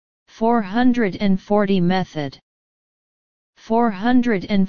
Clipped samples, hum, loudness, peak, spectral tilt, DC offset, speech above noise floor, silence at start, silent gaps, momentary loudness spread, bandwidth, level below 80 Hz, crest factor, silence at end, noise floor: under 0.1%; none; -19 LUFS; -4 dBFS; -8 dB/octave; 3%; over 72 dB; 0.25 s; 2.43-3.53 s; 6 LU; 6.8 kHz; -48 dBFS; 16 dB; 0 s; under -90 dBFS